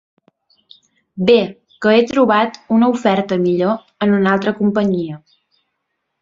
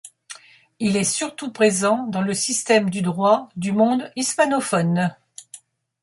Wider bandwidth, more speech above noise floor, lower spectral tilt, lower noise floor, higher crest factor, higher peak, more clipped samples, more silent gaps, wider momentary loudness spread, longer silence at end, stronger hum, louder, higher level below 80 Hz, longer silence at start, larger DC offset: second, 7.6 kHz vs 11.5 kHz; first, 59 dB vs 27 dB; first, -7 dB/octave vs -4.5 dB/octave; first, -73 dBFS vs -47 dBFS; about the same, 16 dB vs 18 dB; first, 0 dBFS vs -4 dBFS; neither; neither; second, 8 LU vs 20 LU; first, 1.05 s vs 0.45 s; neither; first, -16 LUFS vs -20 LUFS; first, -58 dBFS vs -64 dBFS; first, 1.15 s vs 0.05 s; neither